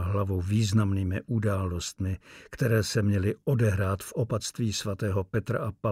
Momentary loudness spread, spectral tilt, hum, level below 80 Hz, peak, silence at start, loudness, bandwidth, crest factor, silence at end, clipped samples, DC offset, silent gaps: 7 LU; -6 dB/octave; none; -50 dBFS; -12 dBFS; 0 s; -28 LUFS; 15.5 kHz; 16 dB; 0 s; under 0.1%; under 0.1%; none